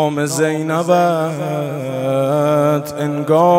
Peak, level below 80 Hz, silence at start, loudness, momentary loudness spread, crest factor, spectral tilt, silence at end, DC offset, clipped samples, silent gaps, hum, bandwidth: 0 dBFS; -62 dBFS; 0 s; -17 LUFS; 7 LU; 14 dB; -6 dB/octave; 0 s; under 0.1%; under 0.1%; none; none; 16 kHz